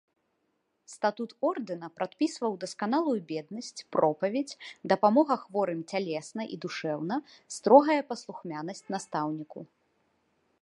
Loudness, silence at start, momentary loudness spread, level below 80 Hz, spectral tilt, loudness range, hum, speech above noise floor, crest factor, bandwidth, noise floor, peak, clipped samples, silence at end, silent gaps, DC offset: -29 LUFS; 0.9 s; 15 LU; -84 dBFS; -5.5 dB/octave; 4 LU; none; 48 dB; 24 dB; 11.5 kHz; -77 dBFS; -4 dBFS; under 0.1%; 1 s; none; under 0.1%